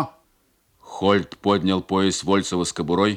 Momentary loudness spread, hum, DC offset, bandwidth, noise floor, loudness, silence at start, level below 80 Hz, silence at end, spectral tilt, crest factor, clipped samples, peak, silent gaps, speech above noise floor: 4 LU; none; under 0.1%; 12.5 kHz; -64 dBFS; -22 LUFS; 0 s; -58 dBFS; 0 s; -5 dB/octave; 18 dB; under 0.1%; -4 dBFS; none; 43 dB